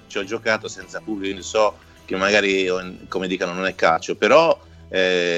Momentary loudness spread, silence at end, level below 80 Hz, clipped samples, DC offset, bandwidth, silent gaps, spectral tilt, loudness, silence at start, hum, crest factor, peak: 12 LU; 0 s; -56 dBFS; under 0.1%; under 0.1%; 9.2 kHz; none; -3.5 dB/octave; -20 LUFS; 0.1 s; none; 18 dB; -2 dBFS